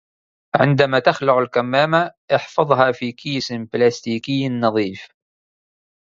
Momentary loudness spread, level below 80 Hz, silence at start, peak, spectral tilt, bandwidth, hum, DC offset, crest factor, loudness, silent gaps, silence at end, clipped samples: 9 LU; -60 dBFS; 0.55 s; 0 dBFS; -6 dB/octave; 7.6 kHz; none; under 0.1%; 20 dB; -18 LUFS; 2.17-2.28 s; 0.95 s; under 0.1%